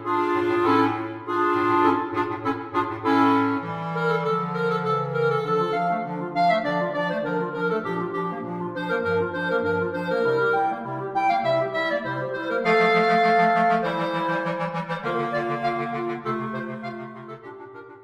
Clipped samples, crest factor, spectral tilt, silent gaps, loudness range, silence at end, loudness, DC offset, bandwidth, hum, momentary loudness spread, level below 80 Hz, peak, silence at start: under 0.1%; 18 dB; -7 dB/octave; none; 4 LU; 0 s; -23 LUFS; under 0.1%; 11 kHz; none; 10 LU; -66 dBFS; -6 dBFS; 0 s